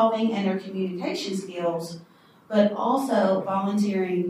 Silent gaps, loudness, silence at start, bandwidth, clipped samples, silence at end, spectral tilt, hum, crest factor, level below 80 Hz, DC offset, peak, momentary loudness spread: none; -25 LUFS; 0 s; 15.5 kHz; under 0.1%; 0 s; -6.5 dB/octave; none; 18 dB; -76 dBFS; under 0.1%; -8 dBFS; 8 LU